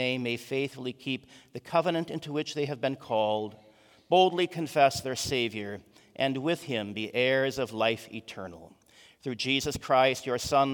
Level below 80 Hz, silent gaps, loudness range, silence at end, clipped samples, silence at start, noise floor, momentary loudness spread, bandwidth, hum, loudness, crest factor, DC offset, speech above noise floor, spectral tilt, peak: -62 dBFS; none; 3 LU; 0 s; under 0.1%; 0 s; -58 dBFS; 16 LU; 18 kHz; none; -29 LUFS; 20 dB; under 0.1%; 30 dB; -4.5 dB/octave; -8 dBFS